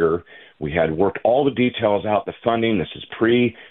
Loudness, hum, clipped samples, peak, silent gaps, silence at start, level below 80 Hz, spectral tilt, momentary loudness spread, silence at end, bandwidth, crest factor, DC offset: -20 LUFS; none; under 0.1%; -4 dBFS; none; 0 s; -48 dBFS; -10.5 dB/octave; 7 LU; 0.05 s; 4.1 kHz; 16 dB; under 0.1%